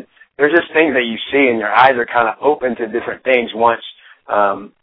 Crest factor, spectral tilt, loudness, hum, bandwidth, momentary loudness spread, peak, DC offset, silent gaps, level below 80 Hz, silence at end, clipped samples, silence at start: 16 dB; -7 dB/octave; -15 LUFS; none; 5.4 kHz; 9 LU; 0 dBFS; under 0.1%; none; -58 dBFS; 0.15 s; under 0.1%; 0.4 s